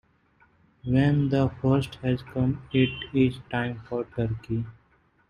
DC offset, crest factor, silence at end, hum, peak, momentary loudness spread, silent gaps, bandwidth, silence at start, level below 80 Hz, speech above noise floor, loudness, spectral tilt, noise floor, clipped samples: under 0.1%; 18 dB; 0.55 s; none; -8 dBFS; 10 LU; none; 11 kHz; 0.85 s; -50 dBFS; 39 dB; -26 LUFS; -8.5 dB/octave; -64 dBFS; under 0.1%